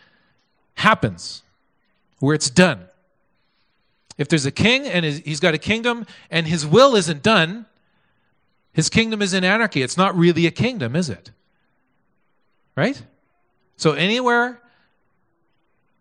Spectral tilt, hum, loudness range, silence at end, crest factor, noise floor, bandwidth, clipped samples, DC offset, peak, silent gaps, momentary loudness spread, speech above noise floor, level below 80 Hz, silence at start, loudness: -4.5 dB/octave; none; 5 LU; 1.45 s; 22 dB; -70 dBFS; 10.5 kHz; under 0.1%; under 0.1%; 0 dBFS; none; 13 LU; 51 dB; -54 dBFS; 0.75 s; -18 LUFS